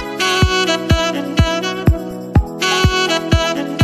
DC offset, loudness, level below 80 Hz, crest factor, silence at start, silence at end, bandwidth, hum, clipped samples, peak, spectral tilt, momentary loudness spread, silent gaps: under 0.1%; -16 LUFS; -24 dBFS; 14 dB; 0 s; 0 s; 15 kHz; none; under 0.1%; -2 dBFS; -4.5 dB/octave; 4 LU; none